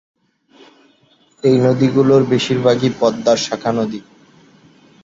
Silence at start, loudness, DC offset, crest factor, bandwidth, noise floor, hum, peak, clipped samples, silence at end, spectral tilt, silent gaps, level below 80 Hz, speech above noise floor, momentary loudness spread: 1.45 s; -15 LUFS; under 0.1%; 16 dB; 7.8 kHz; -55 dBFS; none; -2 dBFS; under 0.1%; 1.05 s; -6 dB/octave; none; -56 dBFS; 40 dB; 7 LU